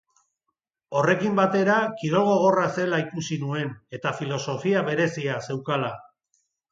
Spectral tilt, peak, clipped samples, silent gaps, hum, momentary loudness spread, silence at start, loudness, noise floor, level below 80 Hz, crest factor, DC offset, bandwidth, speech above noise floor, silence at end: -6 dB/octave; -8 dBFS; under 0.1%; none; none; 10 LU; 0.9 s; -24 LUFS; -81 dBFS; -68 dBFS; 18 dB; under 0.1%; 7.8 kHz; 57 dB; 0.7 s